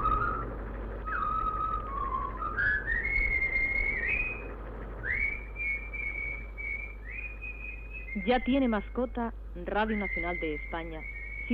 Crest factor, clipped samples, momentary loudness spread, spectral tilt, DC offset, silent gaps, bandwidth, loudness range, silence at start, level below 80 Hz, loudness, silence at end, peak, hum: 16 dB; under 0.1%; 12 LU; -8 dB/octave; under 0.1%; none; 5.2 kHz; 5 LU; 0 s; -40 dBFS; -31 LUFS; 0 s; -16 dBFS; none